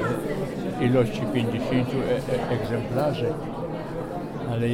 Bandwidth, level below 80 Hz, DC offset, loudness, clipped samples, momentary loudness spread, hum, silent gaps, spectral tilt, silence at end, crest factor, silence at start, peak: 16 kHz; -46 dBFS; under 0.1%; -26 LUFS; under 0.1%; 9 LU; none; none; -7.5 dB/octave; 0 s; 16 dB; 0 s; -10 dBFS